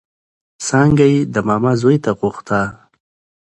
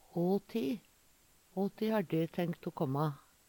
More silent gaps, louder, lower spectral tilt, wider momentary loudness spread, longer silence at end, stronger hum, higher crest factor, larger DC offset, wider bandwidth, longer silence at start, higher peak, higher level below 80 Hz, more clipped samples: neither; first, -15 LUFS vs -36 LUFS; second, -6.5 dB/octave vs -8 dB/octave; first, 9 LU vs 5 LU; first, 0.65 s vs 0.3 s; neither; about the same, 16 dB vs 16 dB; neither; second, 11 kHz vs 19 kHz; first, 0.6 s vs 0.15 s; first, 0 dBFS vs -20 dBFS; first, -46 dBFS vs -72 dBFS; neither